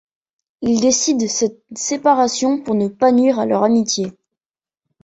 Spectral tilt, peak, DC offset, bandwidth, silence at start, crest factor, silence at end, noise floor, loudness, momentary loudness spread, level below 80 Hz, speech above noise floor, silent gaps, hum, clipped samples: -3.5 dB/octave; -2 dBFS; under 0.1%; 8.2 kHz; 0.6 s; 16 dB; 0.95 s; under -90 dBFS; -17 LUFS; 8 LU; -58 dBFS; over 74 dB; none; none; under 0.1%